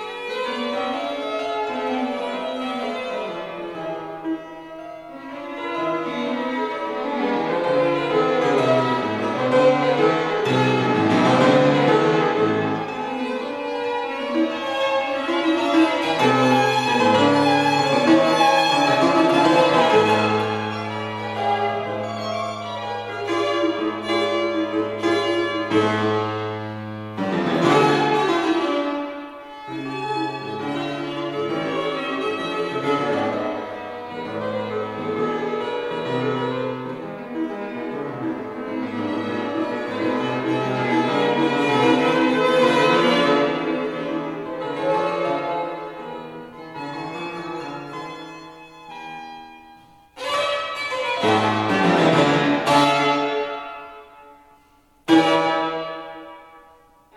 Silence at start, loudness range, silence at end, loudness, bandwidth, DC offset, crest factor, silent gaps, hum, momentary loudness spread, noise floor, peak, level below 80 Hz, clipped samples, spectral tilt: 0 s; 10 LU; 0.55 s; -21 LUFS; 13 kHz; under 0.1%; 18 dB; none; none; 15 LU; -56 dBFS; -4 dBFS; -62 dBFS; under 0.1%; -5.5 dB/octave